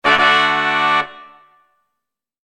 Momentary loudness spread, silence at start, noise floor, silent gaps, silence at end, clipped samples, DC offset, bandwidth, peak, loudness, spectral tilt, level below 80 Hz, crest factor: 7 LU; 0.05 s; -80 dBFS; none; 1.25 s; under 0.1%; under 0.1%; 11 kHz; 0 dBFS; -14 LUFS; -2.5 dB/octave; -56 dBFS; 18 dB